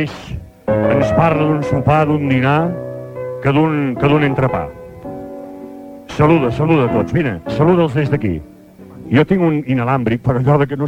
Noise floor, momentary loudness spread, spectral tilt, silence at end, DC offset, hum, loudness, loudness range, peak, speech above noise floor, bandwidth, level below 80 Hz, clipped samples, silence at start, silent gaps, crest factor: -37 dBFS; 17 LU; -8.5 dB/octave; 0 s; under 0.1%; none; -15 LUFS; 2 LU; 0 dBFS; 23 dB; 8.8 kHz; -40 dBFS; under 0.1%; 0 s; none; 16 dB